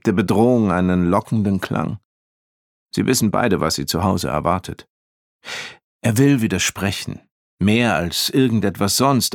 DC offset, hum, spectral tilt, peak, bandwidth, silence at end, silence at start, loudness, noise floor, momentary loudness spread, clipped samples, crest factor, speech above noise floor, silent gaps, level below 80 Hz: under 0.1%; none; -5 dB/octave; -2 dBFS; 18.5 kHz; 0 s; 0.05 s; -18 LUFS; under -90 dBFS; 14 LU; under 0.1%; 16 dB; over 72 dB; 2.05-2.86 s, 4.90-5.40 s, 5.84-6.00 s, 7.31-7.58 s; -46 dBFS